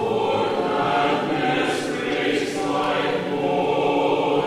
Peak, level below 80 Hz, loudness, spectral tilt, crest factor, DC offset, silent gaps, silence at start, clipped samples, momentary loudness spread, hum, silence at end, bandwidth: -8 dBFS; -58 dBFS; -22 LUFS; -5 dB/octave; 14 dB; under 0.1%; none; 0 s; under 0.1%; 3 LU; none; 0 s; 14 kHz